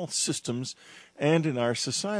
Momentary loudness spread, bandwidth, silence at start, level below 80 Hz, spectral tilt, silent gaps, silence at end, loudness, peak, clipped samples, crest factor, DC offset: 11 LU; 11 kHz; 0 s; -74 dBFS; -4 dB/octave; none; 0 s; -28 LUFS; -10 dBFS; under 0.1%; 18 dB; under 0.1%